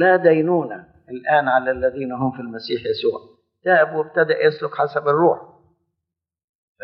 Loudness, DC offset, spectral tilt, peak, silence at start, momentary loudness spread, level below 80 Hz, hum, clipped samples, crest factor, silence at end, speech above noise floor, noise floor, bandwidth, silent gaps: -19 LUFS; under 0.1%; -4 dB/octave; -2 dBFS; 0 s; 12 LU; -58 dBFS; none; under 0.1%; 18 dB; 1.4 s; 64 dB; -83 dBFS; 5.8 kHz; none